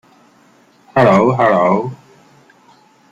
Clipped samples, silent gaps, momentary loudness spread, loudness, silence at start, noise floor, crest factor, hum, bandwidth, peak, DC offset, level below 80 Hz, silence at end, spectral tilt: under 0.1%; none; 9 LU; -13 LUFS; 0.95 s; -50 dBFS; 16 dB; none; 8 kHz; 0 dBFS; under 0.1%; -54 dBFS; 1.15 s; -7.5 dB/octave